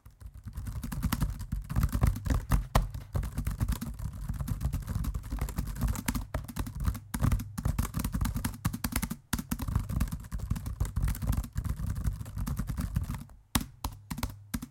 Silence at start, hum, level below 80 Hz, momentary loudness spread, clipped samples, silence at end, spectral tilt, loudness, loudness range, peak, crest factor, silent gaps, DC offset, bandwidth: 0.05 s; none; -36 dBFS; 8 LU; under 0.1%; 0 s; -5.5 dB/octave; -34 LUFS; 3 LU; -6 dBFS; 26 dB; none; under 0.1%; 17 kHz